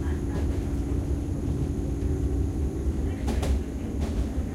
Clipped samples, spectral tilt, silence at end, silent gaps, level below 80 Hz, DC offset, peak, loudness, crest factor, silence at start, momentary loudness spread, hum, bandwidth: under 0.1%; -7.5 dB/octave; 0 s; none; -30 dBFS; under 0.1%; -16 dBFS; -29 LUFS; 12 dB; 0 s; 2 LU; none; 12.5 kHz